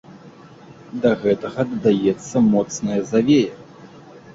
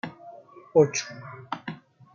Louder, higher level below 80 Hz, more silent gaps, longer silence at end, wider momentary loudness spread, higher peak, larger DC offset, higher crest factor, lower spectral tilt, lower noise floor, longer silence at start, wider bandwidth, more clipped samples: first, -19 LUFS vs -26 LUFS; first, -56 dBFS vs -74 dBFS; neither; second, 0.05 s vs 0.4 s; second, 7 LU vs 24 LU; about the same, -4 dBFS vs -6 dBFS; neither; second, 16 dB vs 22 dB; first, -6 dB/octave vs -4.5 dB/octave; second, -43 dBFS vs -47 dBFS; about the same, 0.1 s vs 0.05 s; about the same, 7.8 kHz vs 7.4 kHz; neither